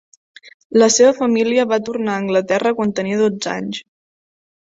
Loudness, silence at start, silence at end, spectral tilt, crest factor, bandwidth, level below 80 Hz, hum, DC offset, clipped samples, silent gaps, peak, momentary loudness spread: -16 LUFS; 0.45 s; 0.9 s; -4 dB/octave; 16 dB; 8 kHz; -62 dBFS; none; under 0.1%; under 0.1%; 0.54-0.70 s; -2 dBFS; 11 LU